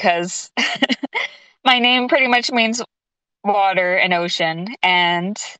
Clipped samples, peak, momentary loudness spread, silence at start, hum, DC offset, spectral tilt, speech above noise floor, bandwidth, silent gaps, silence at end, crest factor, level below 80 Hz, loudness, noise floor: under 0.1%; -2 dBFS; 10 LU; 0 s; none; under 0.1%; -3 dB/octave; 66 dB; 9.2 kHz; none; 0.05 s; 16 dB; -68 dBFS; -17 LUFS; -84 dBFS